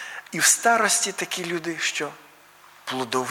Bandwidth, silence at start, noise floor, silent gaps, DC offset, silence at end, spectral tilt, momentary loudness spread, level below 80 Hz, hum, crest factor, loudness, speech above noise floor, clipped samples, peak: 19.5 kHz; 0 s; -51 dBFS; none; under 0.1%; 0 s; -1 dB/octave; 14 LU; -74 dBFS; none; 20 dB; -22 LUFS; 28 dB; under 0.1%; -4 dBFS